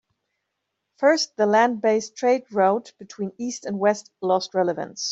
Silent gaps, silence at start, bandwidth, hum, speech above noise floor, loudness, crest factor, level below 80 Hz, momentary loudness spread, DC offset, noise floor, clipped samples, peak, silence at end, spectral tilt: none; 1 s; 8 kHz; none; 57 dB; -22 LUFS; 18 dB; -74 dBFS; 11 LU; under 0.1%; -79 dBFS; under 0.1%; -4 dBFS; 0 s; -4 dB/octave